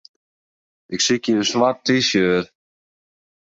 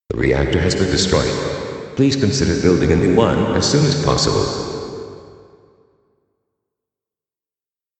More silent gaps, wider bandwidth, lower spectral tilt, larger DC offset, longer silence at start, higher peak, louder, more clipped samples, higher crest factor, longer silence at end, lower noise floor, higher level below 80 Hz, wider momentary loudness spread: neither; second, 7.8 kHz vs 9 kHz; second, -3.5 dB/octave vs -5 dB/octave; neither; first, 0.9 s vs 0.1 s; about the same, -4 dBFS vs -2 dBFS; about the same, -18 LUFS vs -17 LUFS; neither; about the same, 18 dB vs 18 dB; second, 1.05 s vs 2.7 s; about the same, under -90 dBFS vs under -90 dBFS; second, -58 dBFS vs -34 dBFS; second, 8 LU vs 12 LU